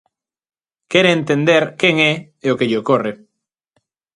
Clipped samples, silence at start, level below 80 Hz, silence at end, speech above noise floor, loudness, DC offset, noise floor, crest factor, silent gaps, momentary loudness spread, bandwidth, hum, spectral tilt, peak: under 0.1%; 0.9 s; -62 dBFS; 1 s; 61 dB; -16 LUFS; under 0.1%; -77 dBFS; 18 dB; none; 7 LU; 11 kHz; none; -5.5 dB/octave; 0 dBFS